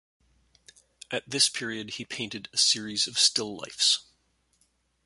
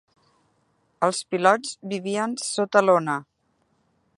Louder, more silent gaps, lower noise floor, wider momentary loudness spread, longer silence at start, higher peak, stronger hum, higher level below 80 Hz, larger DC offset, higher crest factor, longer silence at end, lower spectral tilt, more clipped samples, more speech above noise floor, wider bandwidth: about the same, -25 LUFS vs -23 LUFS; neither; about the same, -70 dBFS vs -69 dBFS; about the same, 13 LU vs 11 LU; about the same, 1.1 s vs 1 s; second, -8 dBFS vs -2 dBFS; neither; first, -70 dBFS vs -78 dBFS; neither; about the same, 24 dB vs 22 dB; about the same, 1.05 s vs 0.95 s; second, -0.5 dB/octave vs -4 dB/octave; neither; second, 42 dB vs 46 dB; about the same, 12 kHz vs 11.5 kHz